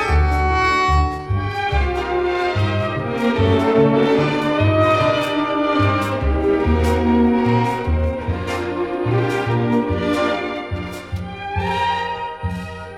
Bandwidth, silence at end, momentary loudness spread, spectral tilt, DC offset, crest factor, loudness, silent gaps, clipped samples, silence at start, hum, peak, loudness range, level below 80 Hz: 14 kHz; 0 s; 10 LU; -7 dB/octave; under 0.1%; 16 dB; -19 LUFS; none; under 0.1%; 0 s; none; -2 dBFS; 4 LU; -30 dBFS